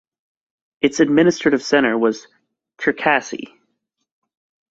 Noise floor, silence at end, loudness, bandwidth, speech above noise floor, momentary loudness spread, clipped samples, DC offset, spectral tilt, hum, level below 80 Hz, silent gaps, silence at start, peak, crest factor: -73 dBFS; 1.25 s; -17 LUFS; 8 kHz; 56 dB; 12 LU; under 0.1%; under 0.1%; -4.5 dB/octave; none; -60 dBFS; none; 0.85 s; -2 dBFS; 18 dB